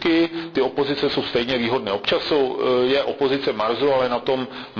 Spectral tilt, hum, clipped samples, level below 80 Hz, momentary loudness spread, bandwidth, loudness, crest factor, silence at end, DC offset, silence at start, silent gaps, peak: -6 dB/octave; none; under 0.1%; -54 dBFS; 4 LU; 5.4 kHz; -21 LUFS; 10 dB; 0 s; under 0.1%; 0 s; none; -10 dBFS